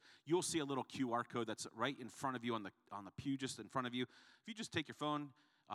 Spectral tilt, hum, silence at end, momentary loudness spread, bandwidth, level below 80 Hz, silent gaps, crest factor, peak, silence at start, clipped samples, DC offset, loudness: -4 dB/octave; none; 0 s; 11 LU; 14.5 kHz; -82 dBFS; none; 20 dB; -22 dBFS; 0.05 s; under 0.1%; under 0.1%; -43 LUFS